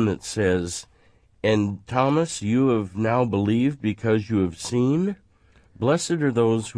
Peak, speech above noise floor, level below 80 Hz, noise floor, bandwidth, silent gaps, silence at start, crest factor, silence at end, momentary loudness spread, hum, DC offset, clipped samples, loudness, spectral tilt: -6 dBFS; 35 dB; -54 dBFS; -57 dBFS; 11 kHz; none; 0 s; 16 dB; 0 s; 6 LU; none; under 0.1%; under 0.1%; -23 LUFS; -6 dB/octave